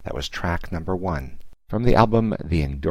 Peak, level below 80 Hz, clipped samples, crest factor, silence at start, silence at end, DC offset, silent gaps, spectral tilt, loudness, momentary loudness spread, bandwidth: -2 dBFS; -32 dBFS; under 0.1%; 20 dB; 0.05 s; 0 s; under 0.1%; none; -7 dB/octave; -23 LUFS; 12 LU; 14.5 kHz